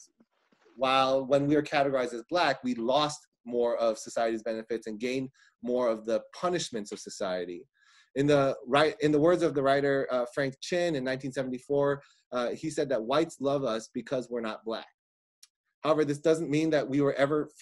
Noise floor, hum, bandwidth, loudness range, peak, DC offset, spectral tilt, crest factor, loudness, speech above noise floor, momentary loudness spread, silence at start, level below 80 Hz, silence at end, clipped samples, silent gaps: -68 dBFS; none; 12 kHz; 5 LU; -10 dBFS; under 0.1%; -5 dB/octave; 18 dB; -29 LUFS; 40 dB; 10 LU; 0.8 s; -68 dBFS; 0.15 s; under 0.1%; 3.27-3.32 s, 3.40-3.44 s, 12.26-12.31 s, 14.94-15.42 s, 15.50-15.64 s, 15.74-15.82 s